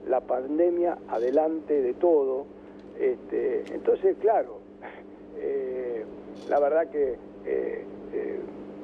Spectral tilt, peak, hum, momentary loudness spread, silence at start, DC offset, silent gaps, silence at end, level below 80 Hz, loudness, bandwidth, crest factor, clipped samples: -8 dB/octave; -12 dBFS; 50 Hz at -55 dBFS; 18 LU; 0 s; under 0.1%; none; 0 s; -62 dBFS; -27 LUFS; 6.2 kHz; 16 dB; under 0.1%